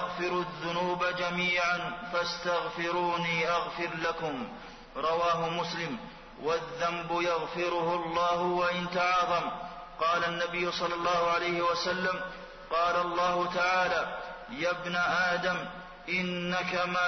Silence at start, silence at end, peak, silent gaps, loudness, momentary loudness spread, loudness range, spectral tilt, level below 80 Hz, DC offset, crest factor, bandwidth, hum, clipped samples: 0 s; 0 s; -18 dBFS; none; -30 LUFS; 9 LU; 3 LU; -4.5 dB/octave; -58 dBFS; under 0.1%; 12 dB; 6.4 kHz; none; under 0.1%